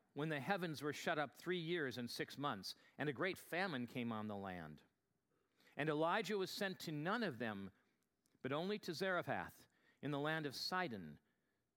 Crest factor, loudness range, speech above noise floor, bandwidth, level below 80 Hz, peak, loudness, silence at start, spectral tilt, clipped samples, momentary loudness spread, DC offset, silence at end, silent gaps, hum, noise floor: 22 dB; 2 LU; 42 dB; 17.5 kHz; -84 dBFS; -22 dBFS; -44 LUFS; 0.15 s; -5 dB/octave; under 0.1%; 11 LU; under 0.1%; 0.6 s; none; none; -86 dBFS